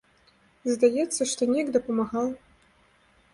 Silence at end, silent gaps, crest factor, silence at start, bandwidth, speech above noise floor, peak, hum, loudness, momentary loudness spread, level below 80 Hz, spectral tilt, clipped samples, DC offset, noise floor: 0.95 s; none; 18 dB; 0.65 s; 11.5 kHz; 37 dB; -8 dBFS; none; -26 LUFS; 9 LU; -64 dBFS; -3.5 dB/octave; under 0.1%; under 0.1%; -62 dBFS